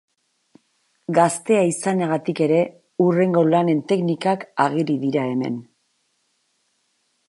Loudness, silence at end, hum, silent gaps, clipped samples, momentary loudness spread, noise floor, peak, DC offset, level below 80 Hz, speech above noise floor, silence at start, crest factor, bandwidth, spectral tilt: -20 LUFS; 1.65 s; none; none; under 0.1%; 7 LU; -69 dBFS; -2 dBFS; under 0.1%; -72 dBFS; 49 dB; 1.1 s; 18 dB; 11.5 kHz; -6 dB/octave